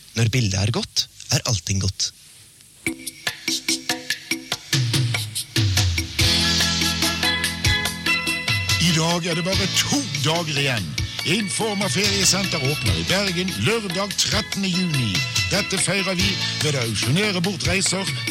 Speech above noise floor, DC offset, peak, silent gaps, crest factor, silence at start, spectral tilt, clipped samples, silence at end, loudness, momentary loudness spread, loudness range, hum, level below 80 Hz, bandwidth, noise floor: 26 dB; under 0.1%; -6 dBFS; none; 16 dB; 0 s; -3 dB/octave; under 0.1%; 0 s; -20 LUFS; 7 LU; 5 LU; none; -42 dBFS; 16.5 kHz; -48 dBFS